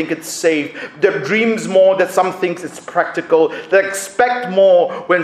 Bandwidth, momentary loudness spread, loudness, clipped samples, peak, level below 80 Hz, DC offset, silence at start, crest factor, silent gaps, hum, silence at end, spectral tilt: 15 kHz; 9 LU; -15 LUFS; under 0.1%; 0 dBFS; -64 dBFS; under 0.1%; 0 s; 16 dB; none; none; 0 s; -4 dB/octave